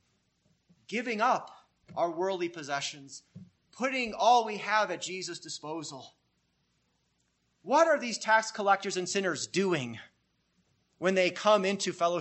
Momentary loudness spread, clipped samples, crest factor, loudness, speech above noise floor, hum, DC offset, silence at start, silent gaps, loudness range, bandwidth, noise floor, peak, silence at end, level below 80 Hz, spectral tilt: 15 LU; under 0.1%; 20 dB; -29 LUFS; 46 dB; 60 Hz at -70 dBFS; under 0.1%; 0.9 s; none; 5 LU; 8.6 kHz; -75 dBFS; -12 dBFS; 0 s; -76 dBFS; -3.5 dB/octave